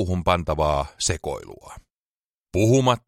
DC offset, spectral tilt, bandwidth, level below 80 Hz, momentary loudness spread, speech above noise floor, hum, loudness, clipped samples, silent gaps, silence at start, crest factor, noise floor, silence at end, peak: under 0.1%; -5 dB/octave; 16 kHz; -38 dBFS; 17 LU; over 68 dB; none; -22 LUFS; under 0.1%; 1.90-2.42 s; 0 s; 20 dB; under -90 dBFS; 0.1 s; -4 dBFS